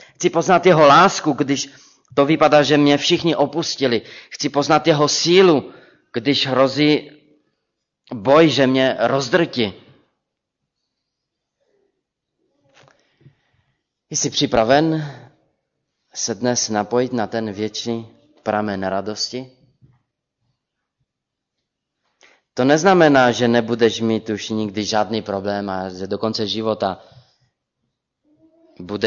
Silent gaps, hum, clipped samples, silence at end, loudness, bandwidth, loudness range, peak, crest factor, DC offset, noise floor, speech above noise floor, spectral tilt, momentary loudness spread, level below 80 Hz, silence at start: none; none; under 0.1%; 0 s; -17 LUFS; 7.6 kHz; 10 LU; -2 dBFS; 16 dB; under 0.1%; -81 dBFS; 64 dB; -4.5 dB/octave; 13 LU; -58 dBFS; 0.2 s